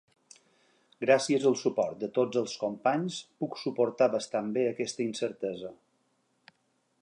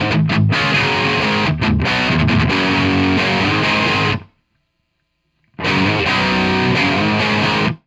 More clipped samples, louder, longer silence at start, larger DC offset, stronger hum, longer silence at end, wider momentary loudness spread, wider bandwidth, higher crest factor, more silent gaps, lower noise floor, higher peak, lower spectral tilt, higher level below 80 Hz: neither; second, -30 LUFS vs -15 LUFS; first, 1 s vs 0 s; neither; neither; first, 1.3 s vs 0.1 s; first, 11 LU vs 2 LU; about the same, 11 kHz vs 11 kHz; first, 22 dB vs 12 dB; neither; first, -74 dBFS vs -69 dBFS; second, -8 dBFS vs -4 dBFS; about the same, -4.5 dB/octave vs -5.5 dB/octave; second, -78 dBFS vs -36 dBFS